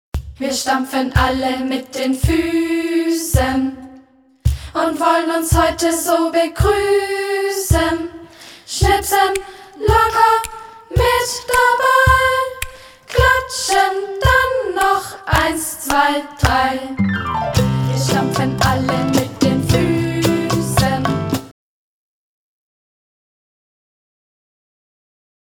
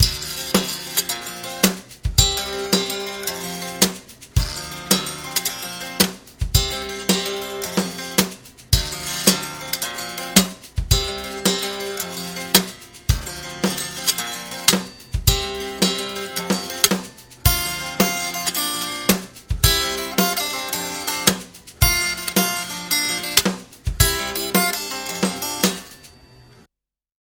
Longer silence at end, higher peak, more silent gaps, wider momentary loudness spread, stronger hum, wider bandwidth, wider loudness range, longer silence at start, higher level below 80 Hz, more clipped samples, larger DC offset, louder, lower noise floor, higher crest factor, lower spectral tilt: first, 3.95 s vs 0.85 s; about the same, 0 dBFS vs 0 dBFS; neither; about the same, 8 LU vs 10 LU; neither; about the same, 19 kHz vs over 20 kHz; about the same, 4 LU vs 2 LU; first, 0.15 s vs 0 s; about the same, -30 dBFS vs -32 dBFS; neither; neither; first, -16 LUFS vs -21 LUFS; second, -47 dBFS vs -86 dBFS; about the same, 18 dB vs 22 dB; first, -4.5 dB/octave vs -2.5 dB/octave